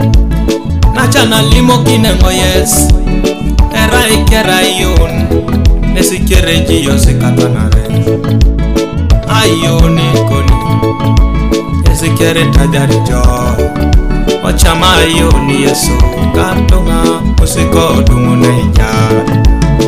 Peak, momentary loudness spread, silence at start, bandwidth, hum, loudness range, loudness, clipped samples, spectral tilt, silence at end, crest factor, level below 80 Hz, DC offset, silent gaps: 0 dBFS; 5 LU; 0 s; 16 kHz; none; 2 LU; -9 LUFS; 2%; -5 dB/octave; 0 s; 8 dB; -12 dBFS; 4%; none